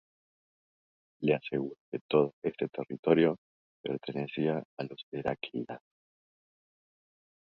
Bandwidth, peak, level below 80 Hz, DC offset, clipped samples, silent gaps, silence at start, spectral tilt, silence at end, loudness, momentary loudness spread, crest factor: 5.4 kHz; -10 dBFS; -70 dBFS; under 0.1%; under 0.1%; 1.80-1.92 s, 2.01-2.09 s, 2.33-2.42 s, 2.99-3.03 s, 3.38-3.84 s, 4.65-4.77 s, 5.03-5.12 s; 1.2 s; -9 dB/octave; 1.75 s; -32 LUFS; 15 LU; 24 dB